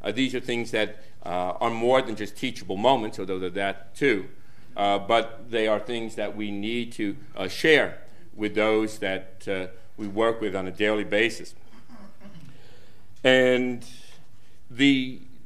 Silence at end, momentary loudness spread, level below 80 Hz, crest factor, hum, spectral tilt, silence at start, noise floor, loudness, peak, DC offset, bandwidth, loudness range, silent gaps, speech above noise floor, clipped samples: 0.3 s; 13 LU; -60 dBFS; 22 dB; none; -4.5 dB/octave; 0.05 s; -57 dBFS; -25 LUFS; -4 dBFS; 2%; 14.5 kHz; 3 LU; none; 32 dB; under 0.1%